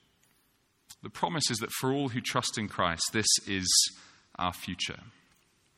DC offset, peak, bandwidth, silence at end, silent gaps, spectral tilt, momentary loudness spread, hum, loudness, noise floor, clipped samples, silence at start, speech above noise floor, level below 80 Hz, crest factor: under 0.1%; -10 dBFS; 16.5 kHz; 0.7 s; none; -2 dB/octave; 12 LU; none; -29 LUFS; -71 dBFS; under 0.1%; 0.9 s; 40 dB; -62 dBFS; 22 dB